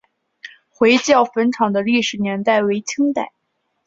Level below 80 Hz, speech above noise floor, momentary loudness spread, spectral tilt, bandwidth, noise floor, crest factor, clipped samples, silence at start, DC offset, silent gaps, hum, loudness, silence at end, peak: -62 dBFS; 54 dB; 7 LU; -4 dB/octave; 7.8 kHz; -71 dBFS; 18 dB; under 0.1%; 0.45 s; under 0.1%; none; none; -17 LUFS; 0.6 s; 0 dBFS